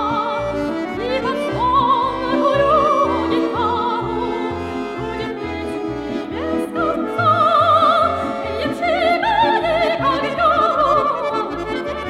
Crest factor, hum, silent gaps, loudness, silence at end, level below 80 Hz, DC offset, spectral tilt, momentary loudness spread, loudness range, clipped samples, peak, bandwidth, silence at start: 14 dB; none; none; -18 LUFS; 0 s; -42 dBFS; under 0.1%; -6 dB/octave; 10 LU; 6 LU; under 0.1%; -4 dBFS; 14 kHz; 0 s